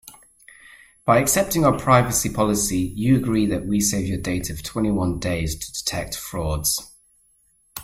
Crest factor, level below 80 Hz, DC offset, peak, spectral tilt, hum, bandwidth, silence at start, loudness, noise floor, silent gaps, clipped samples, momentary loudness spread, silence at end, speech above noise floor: 20 dB; -40 dBFS; under 0.1%; -2 dBFS; -4.5 dB/octave; none; 16 kHz; 0.05 s; -21 LUFS; -61 dBFS; none; under 0.1%; 10 LU; 0 s; 40 dB